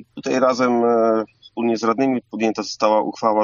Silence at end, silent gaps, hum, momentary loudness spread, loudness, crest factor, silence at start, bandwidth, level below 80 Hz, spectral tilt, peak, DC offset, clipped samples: 0 s; none; none; 7 LU; -19 LUFS; 16 dB; 0.15 s; 7.4 kHz; -68 dBFS; -4 dB/octave; -2 dBFS; under 0.1%; under 0.1%